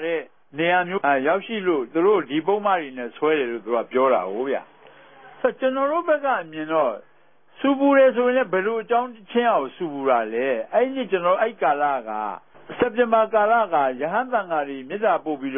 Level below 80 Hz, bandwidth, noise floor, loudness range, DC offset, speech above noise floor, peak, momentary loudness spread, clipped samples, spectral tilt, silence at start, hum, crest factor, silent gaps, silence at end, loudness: -70 dBFS; 3.7 kHz; -58 dBFS; 3 LU; 0.2%; 36 dB; -6 dBFS; 8 LU; under 0.1%; -10 dB/octave; 0 s; none; 16 dB; none; 0 s; -22 LUFS